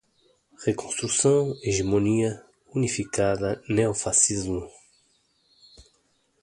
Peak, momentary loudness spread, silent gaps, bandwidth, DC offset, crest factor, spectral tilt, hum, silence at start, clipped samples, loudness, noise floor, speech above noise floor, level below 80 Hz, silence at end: -6 dBFS; 11 LU; none; 11.5 kHz; under 0.1%; 20 dB; -4.5 dB/octave; none; 0.6 s; under 0.1%; -24 LUFS; -68 dBFS; 44 dB; -50 dBFS; 0.6 s